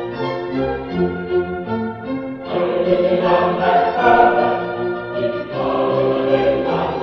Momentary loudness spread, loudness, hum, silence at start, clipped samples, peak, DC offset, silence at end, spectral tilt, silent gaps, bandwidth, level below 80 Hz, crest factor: 10 LU; -18 LUFS; none; 0 s; under 0.1%; -2 dBFS; under 0.1%; 0 s; -8 dB/octave; none; 6.2 kHz; -46 dBFS; 16 dB